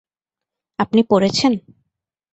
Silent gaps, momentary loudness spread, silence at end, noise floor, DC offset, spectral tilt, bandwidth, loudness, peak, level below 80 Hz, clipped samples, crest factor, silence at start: none; 11 LU; 0.75 s; -87 dBFS; under 0.1%; -5 dB/octave; 8.2 kHz; -17 LUFS; -4 dBFS; -56 dBFS; under 0.1%; 18 dB; 0.8 s